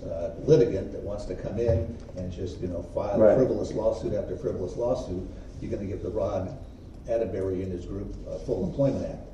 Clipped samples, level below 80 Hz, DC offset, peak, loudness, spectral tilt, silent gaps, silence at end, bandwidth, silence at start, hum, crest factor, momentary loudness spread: under 0.1%; -42 dBFS; under 0.1%; -6 dBFS; -28 LUFS; -8 dB/octave; none; 0 s; 9.6 kHz; 0 s; none; 22 dB; 15 LU